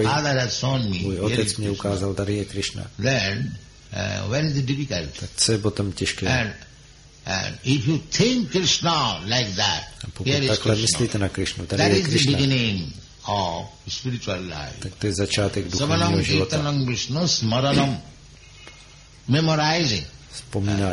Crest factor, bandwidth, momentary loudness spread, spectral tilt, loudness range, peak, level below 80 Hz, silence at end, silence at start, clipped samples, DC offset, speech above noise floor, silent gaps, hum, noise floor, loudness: 18 dB; 11.5 kHz; 11 LU; -4.5 dB/octave; 4 LU; -6 dBFS; -44 dBFS; 0 s; 0 s; under 0.1%; under 0.1%; 25 dB; none; none; -48 dBFS; -22 LUFS